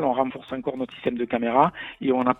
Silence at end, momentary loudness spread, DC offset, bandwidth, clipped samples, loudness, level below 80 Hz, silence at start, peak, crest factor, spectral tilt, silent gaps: 0.05 s; 10 LU; under 0.1%; 4 kHz; under 0.1%; -25 LUFS; -60 dBFS; 0 s; -4 dBFS; 20 dB; -8.5 dB/octave; none